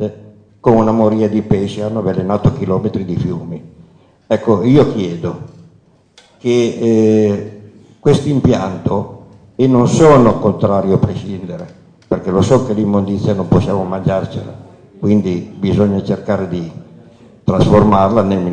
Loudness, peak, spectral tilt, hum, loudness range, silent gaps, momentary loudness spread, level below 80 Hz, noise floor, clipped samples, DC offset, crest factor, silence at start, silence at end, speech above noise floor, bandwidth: -14 LUFS; -2 dBFS; -8 dB/octave; none; 5 LU; none; 14 LU; -38 dBFS; -49 dBFS; under 0.1%; under 0.1%; 14 dB; 0 s; 0 s; 36 dB; 9.6 kHz